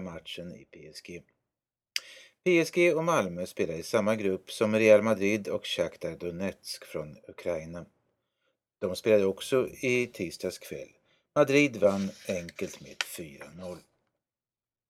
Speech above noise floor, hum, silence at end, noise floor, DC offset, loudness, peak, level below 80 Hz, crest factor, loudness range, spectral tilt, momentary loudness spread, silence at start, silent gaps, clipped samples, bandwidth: over 61 dB; none; 1.1 s; under -90 dBFS; under 0.1%; -28 LUFS; -8 dBFS; -66 dBFS; 22 dB; 7 LU; -5 dB/octave; 20 LU; 0 s; none; under 0.1%; 15.5 kHz